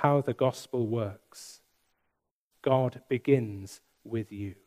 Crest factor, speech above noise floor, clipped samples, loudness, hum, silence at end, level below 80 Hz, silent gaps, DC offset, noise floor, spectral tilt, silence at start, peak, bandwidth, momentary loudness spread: 22 dB; 52 dB; under 0.1%; -30 LUFS; none; 0.15 s; -72 dBFS; 2.31-2.51 s; under 0.1%; -81 dBFS; -7 dB/octave; 0 s; -8 dBFS; 15.5 kHz; 20 LU